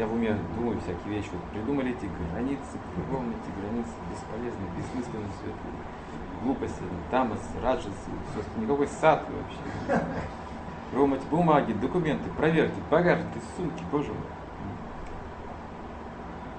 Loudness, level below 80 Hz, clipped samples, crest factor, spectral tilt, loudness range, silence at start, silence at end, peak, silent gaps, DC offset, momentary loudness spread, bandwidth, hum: -30 LUFS; -46 dBFS; under 0.1%; 22 dB; -7 dB/octave; 9 LU; 0 s; 0 s; -6 dBFS; none; under 0.1%; 16 LU; 8.8 kHz; none